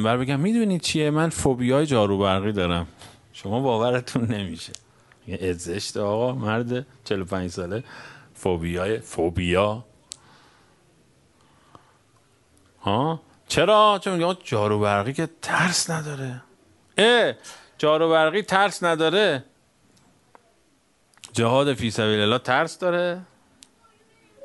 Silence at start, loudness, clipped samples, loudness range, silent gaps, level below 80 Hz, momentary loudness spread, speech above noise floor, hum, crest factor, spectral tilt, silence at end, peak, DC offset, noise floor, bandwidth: 0 s; -23 LUFS; under 0.1%; 6 LU; none; -52 dBFS; 16 LU; 41 dB; none; 24 dB; -5 dB/octave; 0 s; 0 dBFS; under 0.1%; -63 dBFS; 11.5 kHz